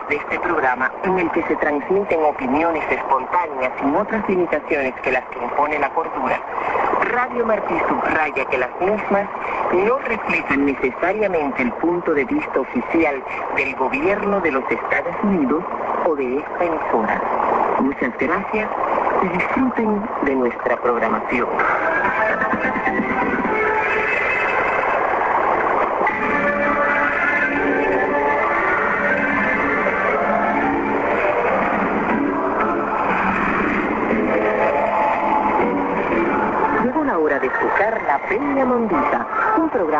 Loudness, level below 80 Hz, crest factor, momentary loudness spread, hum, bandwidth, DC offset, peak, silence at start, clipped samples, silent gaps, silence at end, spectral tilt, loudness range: -19 LUFS; -48 dBFS; 14 dB; 3 LU; none; 8 kHz; under 0.1%; -4 dBFS; 0 s; under 0.1%; none; 0 s; -7 dB/octave; 2 LU